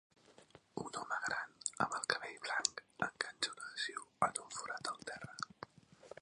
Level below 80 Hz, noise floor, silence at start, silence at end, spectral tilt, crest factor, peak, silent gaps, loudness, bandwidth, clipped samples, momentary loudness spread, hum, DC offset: -78 dBFS; -64 dBFS; 0.3 s; 0.1 s; -1.5 dB/octave; 32 dB; -10 dBFS; none; -41 LUFS; 11 kHz; under 0.1%; 11 LU; none; under 0.1%